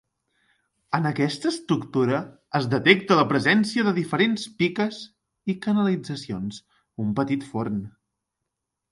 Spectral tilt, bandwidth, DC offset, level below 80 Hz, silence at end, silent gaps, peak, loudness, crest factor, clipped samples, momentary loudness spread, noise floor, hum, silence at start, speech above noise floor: -6 dB/octave; 11.5 kHz; under 0.1%; -62 dBFS; 1 s; none; 0 dBFS; -24 LUFS; 24 dB; under 0.1%; 14 LU; -83 dBFS; none; 0.9 s; 59 dB